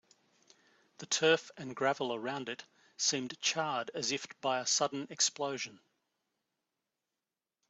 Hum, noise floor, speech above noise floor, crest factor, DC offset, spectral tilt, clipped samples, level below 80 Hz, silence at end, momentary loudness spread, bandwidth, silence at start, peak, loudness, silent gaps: none; under -90 dBFS; over 56 dB; 24 dB; under 0.1%; -1.5 dB/octave; under 0.1%; -84 dBFS; 1.95 s; 12 LU; 8.2 kHz; 1 s; -14 dBFS; -33 LUFS; none